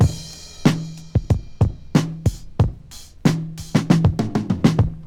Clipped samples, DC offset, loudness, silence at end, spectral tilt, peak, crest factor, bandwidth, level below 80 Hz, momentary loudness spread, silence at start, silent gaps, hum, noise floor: under 0.1%; under 0.1%; -21 LUFS; 0 s; -7 dB/octave; 0 dBFS; 20 dB; 16 kHz; -34 dBFS; 10 LU; 0 s; none; none; -40 dBFS